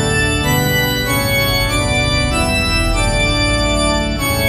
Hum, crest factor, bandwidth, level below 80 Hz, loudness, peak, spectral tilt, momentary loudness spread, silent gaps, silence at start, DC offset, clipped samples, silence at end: none; 14 dB; 14 kHz; -22 dBFS; -15 LUFS; -2 dBFS; -4 dB/octave; 2 LU; none; 0 s; under 0.1%; under 0.1%; 0 s